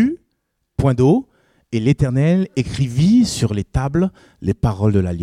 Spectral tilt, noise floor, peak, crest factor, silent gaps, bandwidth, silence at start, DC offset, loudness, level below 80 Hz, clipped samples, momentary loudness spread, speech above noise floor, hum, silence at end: -7 dB/octave; -71 dBFS; -4 dBFS; 14 dB; none; 13.5 kHz; 0 s; under 0.1%; -18 LUFS; -36 dBFS; under 0.1%; 10 LU; 55 dB; none; 0 s